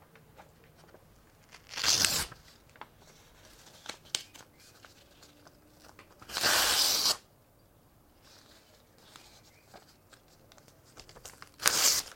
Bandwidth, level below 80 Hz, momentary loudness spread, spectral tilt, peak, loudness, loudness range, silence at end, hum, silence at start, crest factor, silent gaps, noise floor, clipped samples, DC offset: 16.5 kHz; -64 dBFS; 28 LU; 0.5 dB/octave; -4 dBFS; -27 LUFS; 15 LU; 0 s; none; 0.4 s; 32 dB; none; -63 dBFS; under 0.1%; under 0.1%